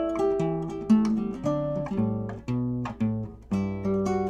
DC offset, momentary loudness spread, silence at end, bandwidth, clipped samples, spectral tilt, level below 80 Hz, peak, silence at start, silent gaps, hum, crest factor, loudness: under 0.1%; 8 LU; 0 s; 9.2 kHz; under 0.1%; -8.5 dB/octave; -50 dBFS; -12 dBFS; 0 s; none; none; 16 dB; -28 LUFS